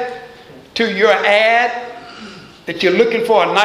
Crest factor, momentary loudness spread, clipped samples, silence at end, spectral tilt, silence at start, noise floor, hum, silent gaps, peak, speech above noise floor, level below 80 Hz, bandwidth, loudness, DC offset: 16 dB; 22 LU; under 0.1%; 0 s; -4 dB/octave; 0 s; -39 dBFS; none; none; 0 dBFS; 26 dB; -58 dBFS; 14 kHz; -13 LUFS; under 0.1%